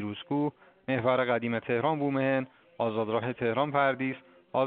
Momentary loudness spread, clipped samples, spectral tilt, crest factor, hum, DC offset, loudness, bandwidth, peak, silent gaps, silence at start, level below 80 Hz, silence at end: 8 LU; under 0.1%; -5 dB/octave; 18 dB; none; under 0.1%; -29 LUFS; 4.5 kHz; -12 dBFS; none; 0 s; -72 dBFS; 0 s